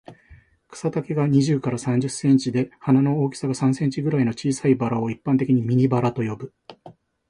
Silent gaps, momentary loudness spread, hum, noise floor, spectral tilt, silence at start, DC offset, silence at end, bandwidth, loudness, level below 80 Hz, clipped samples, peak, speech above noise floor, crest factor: none; 8 LU; none; -52 dBFS; -7 dB/octave; 0.1 s; under 0.1%; 0.4 s; 11 kHz; -22 LUFS; -58 dBFS; under 0.1%; -6 dBFS; 31 dB; 16 dB